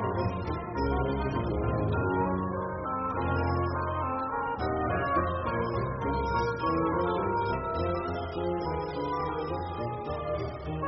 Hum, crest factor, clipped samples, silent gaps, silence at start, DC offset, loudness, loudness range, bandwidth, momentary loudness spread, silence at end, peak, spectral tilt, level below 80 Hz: none; 14 dB; under 0.1%; none; 0 s; under 0.1%; -31 LUFS; 2 LU; 5.8 kHz; 5 LU; 0 s; -16 dBFS; -6.5 dB/octave; -44 dBFS